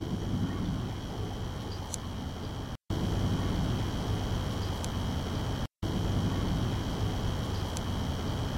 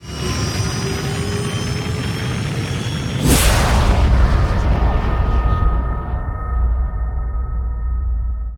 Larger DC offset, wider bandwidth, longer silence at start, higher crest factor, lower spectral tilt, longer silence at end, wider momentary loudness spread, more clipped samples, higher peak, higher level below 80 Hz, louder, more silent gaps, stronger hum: neither; about the same, 16.5 kHz vs 17 kHz; about the same, 0 s vs 0 s; about the same, 16 dB vs 16 dB; about the same, -6 dB/octave vs -5 dB/octave; about the same, 0 s vs 0 s; about the same, 7 LU vs 9 LU; neither; second, -16 dBFS vs -2 dBFS; second, -38 dBFS vs -20 dBFS; second, -33 LUFS vs -19 LUFS; neither; neither